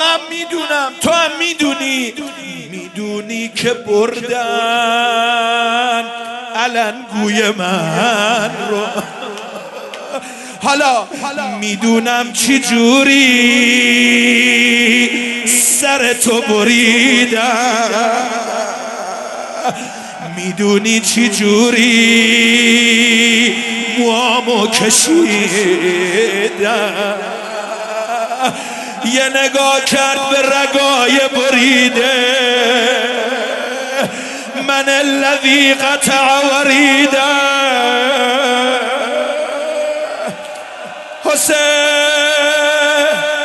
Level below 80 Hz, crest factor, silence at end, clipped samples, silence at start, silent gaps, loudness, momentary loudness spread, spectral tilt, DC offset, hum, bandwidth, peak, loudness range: -60 dBFS; 14 dB; 0 s; under 0.1%; 0 s; none; -12 LUFS; 14 LU; -2 dB/octave; under 0.1%; none; 13 kHz; 0 dBFS; 8 LU